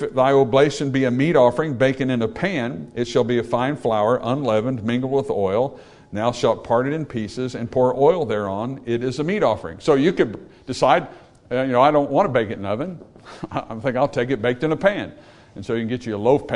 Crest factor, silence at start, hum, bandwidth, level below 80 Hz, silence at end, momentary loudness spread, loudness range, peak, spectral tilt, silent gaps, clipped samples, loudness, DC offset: 18 dB; 0 s; none; 11 kHz; -52 dBFS; 0 s; 11 LU; 3 LU; -2 dBFS; -6.5 dB/octave; none; under 0.1%; -20 LUFS; under 0.1%